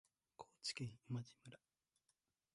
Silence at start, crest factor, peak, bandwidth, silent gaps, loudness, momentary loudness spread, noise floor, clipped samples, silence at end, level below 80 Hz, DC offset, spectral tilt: 0.4 s; 20 dB; -34 dBFS; 11.5 kHz; none; -50 LUFS; 17 LU; -87 dBFS; under 0.1%; 1 s; -84 dBFS; under 0.1%; -4 dB/octave